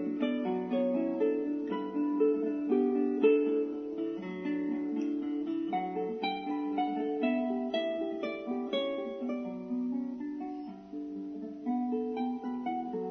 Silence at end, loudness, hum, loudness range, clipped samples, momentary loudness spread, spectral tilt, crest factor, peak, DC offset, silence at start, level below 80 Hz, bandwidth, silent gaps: 0 s; -33 LUFS; none; 7 LU; under 0.1%; 9 LU; -4.5 dB/octave; 18 dB; -14 dBFS; under 0.1%; 0 s; -74 dBFS; 6.2 kHz; none